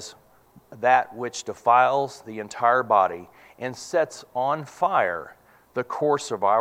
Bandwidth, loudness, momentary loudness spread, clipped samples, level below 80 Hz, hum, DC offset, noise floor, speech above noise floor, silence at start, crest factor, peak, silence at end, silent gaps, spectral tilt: 15.5 kHz; -23 LUFS; 16 LU; under 0.1%; -70 dBFS; none; under 0.1%; -55 dBFS; 32 dB; 0 s; 20 dB; -4 dBFS; 0 s; none; -4 dB/octave